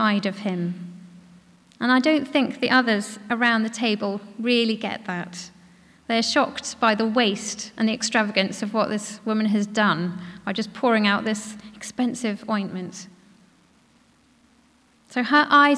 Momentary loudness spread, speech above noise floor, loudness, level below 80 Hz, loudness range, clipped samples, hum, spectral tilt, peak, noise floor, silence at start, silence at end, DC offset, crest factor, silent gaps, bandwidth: 13 LU; 36 dB; -23 LUFS; -68 dBFS; 6 LU; under 0.1%; none; -4 dB/octave; -6 dBFS; -59 dBFS; 0 s; 0 s; under 0.1%; 18 dB; none; 11 kHz